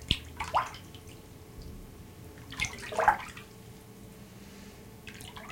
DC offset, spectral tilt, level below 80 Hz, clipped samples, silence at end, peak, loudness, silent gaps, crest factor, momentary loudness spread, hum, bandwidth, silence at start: under 0.1%; -3 dB/octave; -50 dBFS; under 0.1%; 0 s; -6 dBFS; -32 LUFS; none; 30 dB; 22 LU; none; 17 kHz; 0 s